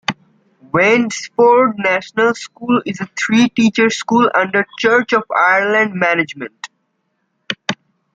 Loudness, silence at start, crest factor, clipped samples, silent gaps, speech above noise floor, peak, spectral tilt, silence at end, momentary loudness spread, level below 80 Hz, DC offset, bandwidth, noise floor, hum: -15 LUFS; 0.1 s; 14 dB; under 0.1%; none; 54 dB; 0 dBFS; -4.5 dB/octave; 0.4 s; 13 LU; -60 dBFS; under 0.1%; 9 kHz; -68 dBFS; none